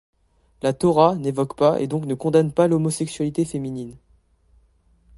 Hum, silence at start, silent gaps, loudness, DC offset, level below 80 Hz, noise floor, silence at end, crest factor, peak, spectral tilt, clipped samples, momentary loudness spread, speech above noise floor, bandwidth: none; 0.65 s; none; -21 LUFS; under 0.1%; -54 dBFS; -59 dBFS; 1.2 s; 20 dB; -2 dBFS; -6.5 dB/octave; under 0.1%; 10 LU; 39 dB; 11.5 kHz